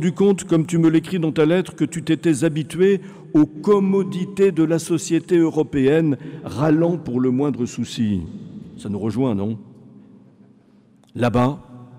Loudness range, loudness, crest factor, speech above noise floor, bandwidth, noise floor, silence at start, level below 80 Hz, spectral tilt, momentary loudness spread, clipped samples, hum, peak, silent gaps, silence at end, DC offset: 7 LU; -20 LUFS; 12 dB; 34 dB; 14 kHz; -53 dBFS; 0 s; -52 dBFS; -7 dB/octave; 10 LU; under 0.1%; none; -8 dBFS; none; 0 s; under 0.1%